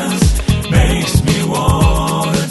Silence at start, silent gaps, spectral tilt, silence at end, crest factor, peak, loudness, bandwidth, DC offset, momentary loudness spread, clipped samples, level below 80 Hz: 0 s; none; -5 dB/octave; 0 s; 12 dB; 0 dBFS; -14 LUFS; 12.5 kHz; under 0.1%; 3 LU; under 0.1%; -18 dBFS